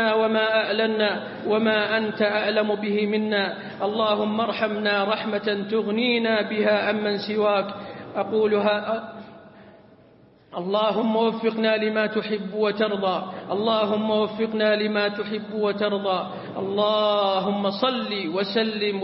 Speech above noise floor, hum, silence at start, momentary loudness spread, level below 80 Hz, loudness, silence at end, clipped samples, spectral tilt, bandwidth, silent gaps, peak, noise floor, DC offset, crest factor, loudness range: 30 dB; none; 0 s; 8 LU; -68 dBFS; -23 LUFS; 0 s; under 0.1%; -9.5 dB/octave; 5.8 kHz; none; -6 dBFS; -53 dBFS; under 0.1%; 16 dB; 3 LU